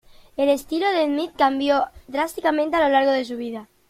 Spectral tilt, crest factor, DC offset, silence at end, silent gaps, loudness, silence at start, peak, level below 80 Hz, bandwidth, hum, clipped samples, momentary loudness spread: -3.5 dB/octave; 16 dB; under 0.1%; 0.25 s; none; -21 LUFS; 0.4 s; -4 dBFS; -54 dBFS; 16 kHz; none; under 0.1%; 10 LU